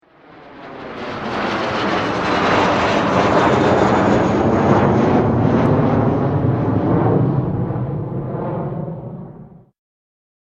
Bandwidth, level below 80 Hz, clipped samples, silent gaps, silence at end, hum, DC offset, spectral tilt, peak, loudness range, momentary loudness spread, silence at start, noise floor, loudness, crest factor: 8.4 kHz; -40 dBFS; under 0.1%; none; 1 s; none; under 0.1%; -7.5 dB/octave; -2 dBFS; 6 LU; 14 LU; 0.3 s; -43 dBFS; -17 LUFS; 16 dB